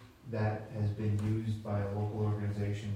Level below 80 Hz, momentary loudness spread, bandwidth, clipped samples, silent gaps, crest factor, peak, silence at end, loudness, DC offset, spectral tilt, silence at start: -58 dBFS; 3 LU; 9 kHz; under 0.1%; none; 12 dB; -22 dBFS; 0 s; -35 LUFS; under 0.1%; -8.5 dB/octave; 0 s